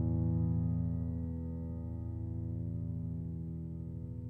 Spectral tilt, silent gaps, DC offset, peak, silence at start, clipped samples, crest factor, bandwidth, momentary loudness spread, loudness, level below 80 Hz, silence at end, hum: -13.5 dB/octave; none; under 0.1%; -24 dBFS; 0 s; under 0.1%; 12 dB; 2 kHz; 9 LU; -38 LUFS; -46 dBFS; 0 s; none